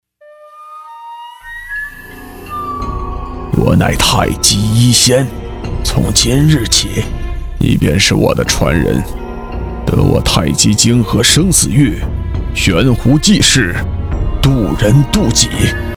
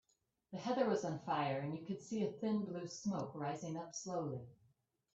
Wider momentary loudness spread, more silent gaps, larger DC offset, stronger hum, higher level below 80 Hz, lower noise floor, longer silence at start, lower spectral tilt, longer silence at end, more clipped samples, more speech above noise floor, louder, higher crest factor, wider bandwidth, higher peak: first, 16 LU vs 9 LU; neither; neither; neither; first, -22 dBFS vs -80 dBFS; second, -40 dBFS vs -77 dBFS; about the same, 0.4 s vs 0.5 s; second, -4 dB/octave vs -6 dB/octave; second, 0 s vs 0.6 s; neither; second, 29 dB vs 37 dB; first, -11 LUFS vs -41 LUFS; second, 12 dB vs 20 dB; first, over 20 kHz vs 8 kHz; first, 0 dBFS vs -22 dBFS